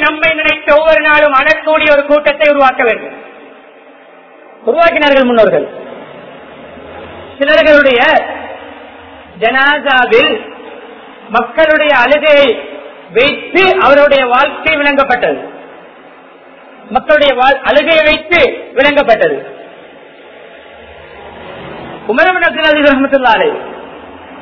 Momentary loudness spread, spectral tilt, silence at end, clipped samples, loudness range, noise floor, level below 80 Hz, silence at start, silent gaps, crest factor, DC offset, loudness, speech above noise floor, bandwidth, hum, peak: 22 LU; -5 dB/octave; 0 s; 0.8%; 4 LU; -38 dBFS; -42 dBFS; 0 s; none; 12 dB; under 0.1%; -9 LUFS; 29 dB; 6 kHz; none; 0 dBFS